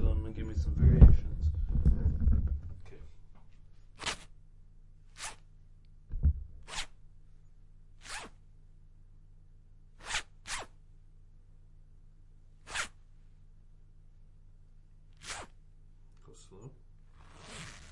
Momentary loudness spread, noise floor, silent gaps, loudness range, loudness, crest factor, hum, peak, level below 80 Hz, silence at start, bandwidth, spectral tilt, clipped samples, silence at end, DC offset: 25 LU; -55 dBFS; none; 22 LU; -32 LUFS; 28 dB; none; -6 dBFS; -34 dBFS; 0 s; 11.5 kHz; -5.5 dB/octave; under 0.1%; 0.2 s; under 0.1%